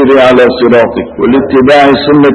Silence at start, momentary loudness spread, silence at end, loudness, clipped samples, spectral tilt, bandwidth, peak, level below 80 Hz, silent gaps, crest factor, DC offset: 0 s; 5 LU; 0 s; -6 LUFS; 3%; -6.5 dB/octave; 11 kHz; 0 dBFS; -36 dBFS; none; 6 dB; under 0.1%